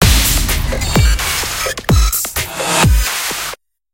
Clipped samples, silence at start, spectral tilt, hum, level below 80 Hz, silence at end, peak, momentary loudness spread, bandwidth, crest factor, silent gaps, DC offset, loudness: under 0.1%; 0 s; -3 dB/octave; none; -18 dBFS; 0.4 s; 0 dBFS; 7 LU; 17.5 kHz; 14 dB; none; under 0.1%; -15 LUFS